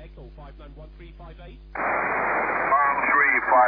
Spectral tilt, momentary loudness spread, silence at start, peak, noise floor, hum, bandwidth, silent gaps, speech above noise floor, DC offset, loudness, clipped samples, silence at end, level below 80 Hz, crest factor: -8.5 dB/octave; 12 LU; 0 s; -8 dBFS; -42 dBFS; none; 5.2 kHz; none; 12 dB; under 0.1%; -21 LUFS; under 0.1%; 0 s; -46 dBFS; 16 dB